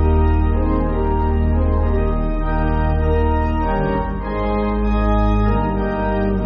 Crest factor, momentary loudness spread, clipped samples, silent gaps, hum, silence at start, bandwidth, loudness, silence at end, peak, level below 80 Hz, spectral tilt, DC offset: 12 dB; 4 LU; under 0.1%; none; none; 0 s; 5.2 kHz; -19 LUFS; 0 s; -6 dBFS; -20 dBFS; -8 dB/octave; under 0.1%